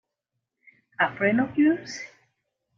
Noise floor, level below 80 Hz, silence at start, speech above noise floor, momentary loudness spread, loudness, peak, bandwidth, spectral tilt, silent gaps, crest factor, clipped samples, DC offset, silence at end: -83 dBFS; -68 dBFS; 1 s; 59 dB; 19 LU; -24 LUFS; -8 dBFS; 7.4 kHz; -5.5 dB/octave; none; 20 dB; under 0.1%; under 0.1%; 0.7 s